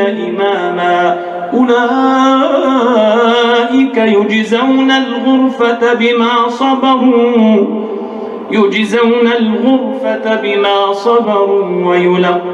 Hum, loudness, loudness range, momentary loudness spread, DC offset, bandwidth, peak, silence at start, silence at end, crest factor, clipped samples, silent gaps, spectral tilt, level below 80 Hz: none; -11 LUFS; 2 LU; 5 LU; under 0.1%; 8.4 kHz; 0 dBFS; 0 s; 0 s; 10 dB; under 0.1%; none; -5.5 dB/octave; -60 dBFS